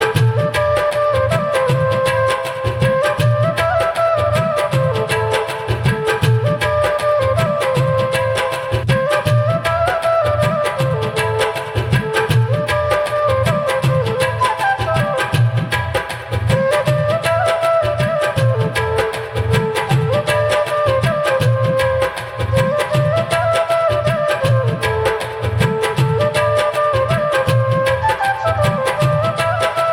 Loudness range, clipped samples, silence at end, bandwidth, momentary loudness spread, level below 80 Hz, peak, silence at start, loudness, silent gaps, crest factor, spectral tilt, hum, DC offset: 1 LU; under 0.1%; 0 s; 16.5 kHz; 3 LU; -40 dBFS; -2 dBFS; 0 s; -16 LUFS; none; 14 dB; -5.5 dB/octave; none; under 0.1%